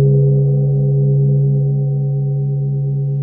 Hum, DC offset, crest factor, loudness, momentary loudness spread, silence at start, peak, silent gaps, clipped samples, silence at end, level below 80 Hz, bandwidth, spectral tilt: none; under 0.1%; 10 dB; -15 LUFS; 5 LU; 0 s; -4 dBFS; none; under 0.1%; 0 s; -40 dBFS; 0.8 kHz; -16.5 dB/octave